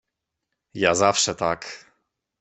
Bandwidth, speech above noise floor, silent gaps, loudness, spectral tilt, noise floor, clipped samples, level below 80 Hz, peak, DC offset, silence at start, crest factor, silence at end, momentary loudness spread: 8.4 kHz; 59 dB; none; -21 LUFS; -2.5 dB/octave; -81 dBFS; under 0.1%; -60 dBFS; -4 dBFS; under 0.1%; 0.75 s; 22 dB; 0.65 s; 21 LU